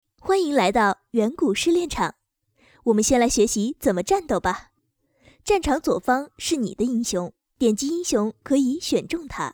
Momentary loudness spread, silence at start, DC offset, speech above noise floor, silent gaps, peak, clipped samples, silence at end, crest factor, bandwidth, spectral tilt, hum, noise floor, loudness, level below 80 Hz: 8 LU; 0.25 s; under 0.1%; 48 dB; none; -6 dBFS; under 0.1%; 0 s; 16 dB; over 20 kHz; -4 dB/octave; none; -70 dBFS; -22 LUFS; -46 dBFS